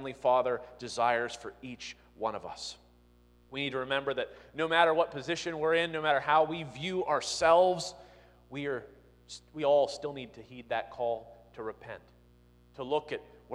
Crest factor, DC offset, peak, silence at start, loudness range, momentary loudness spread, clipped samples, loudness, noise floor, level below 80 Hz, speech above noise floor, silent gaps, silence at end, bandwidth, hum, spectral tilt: 22 dB; under 0.1%; -10 dBFS; 0 s; 8 LU; 18 LU; under 0.1%; -31 LUFS; -62 dBFS; -64 dBFS; 31 dB; none; 0 s; 11.5 kHz; 60 Hz at -60 dBFS; -3.5 dB/octave